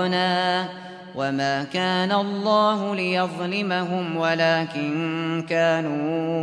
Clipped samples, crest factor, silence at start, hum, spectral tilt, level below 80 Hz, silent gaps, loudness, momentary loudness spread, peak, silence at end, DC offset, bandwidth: under 0.1%; 16 dB; 0 s; none; -5.5 dB/octave; -70 dBFS; none; -23 LUFS; 6 LU; -8 dBFS; 0 s; under 0.1%; 11 kHz